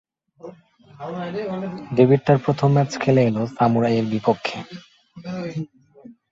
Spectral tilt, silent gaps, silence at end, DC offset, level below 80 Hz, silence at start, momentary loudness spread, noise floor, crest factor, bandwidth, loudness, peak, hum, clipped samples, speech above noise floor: -7.5 dB/octave; none; 0.2 s; under 0.1%; -58 dBFS; 0.45 s; 22 LU; -49 dBFS; 20 dB; 7.6 kHz; -20 LUFS; -2 dBFS; none; under 0.1%; 29 dB